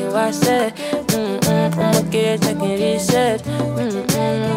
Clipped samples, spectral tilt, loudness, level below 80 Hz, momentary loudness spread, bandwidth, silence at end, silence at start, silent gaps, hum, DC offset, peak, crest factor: under 0.1%; -5 dB/octave; -18 LUFS; -50 dBFS; 5 LU; 16.5 kHz; 0 s; 0 s; none; none; under 0.1%; -2 dBFS; 16 dB